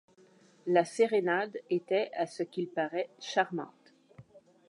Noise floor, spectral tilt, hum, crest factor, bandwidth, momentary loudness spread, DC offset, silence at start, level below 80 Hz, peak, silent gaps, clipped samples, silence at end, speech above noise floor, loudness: -62 dBFS; -5 dB/octave; none; 20 dB; 11 kHz; 9 LU; under 0.1%; 0.65 s; -84 dBFS; -12 dBFS; none; under 0.1%; 0.3 s; 31 dB; -31 LUFS